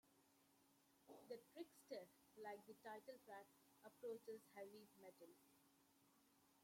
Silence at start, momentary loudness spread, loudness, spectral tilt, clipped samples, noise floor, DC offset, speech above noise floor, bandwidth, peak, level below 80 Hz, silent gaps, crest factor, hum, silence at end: 0.05 s; 12 LU; -60 LUFS; -4 dB/octave; under 0.1%; -79 dBFS; under 0.1%; 19 dB; 16.5 kHz; -42 dBFS; under -90 dBFS; none; 20 dB; none; 0 s